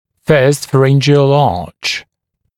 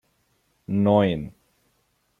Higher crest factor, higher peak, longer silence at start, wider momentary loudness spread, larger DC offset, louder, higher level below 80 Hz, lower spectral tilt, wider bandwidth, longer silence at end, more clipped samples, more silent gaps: second, 12 dB vs 20 dB; first, 0 dBFS vs -6 dBFS; second, 0.3 s vs 0.7 s; second, 9 LU vs 21 LU; neither; first, -12 LUFS vs -22 LUFS; first, -46 dBFS vs -56 dBFS; second, -6 dB/octave vs -9 dB/octave; first, 14 kHz vs 4 kHz; second, 0.55 s vs 0.9 s; neither; neither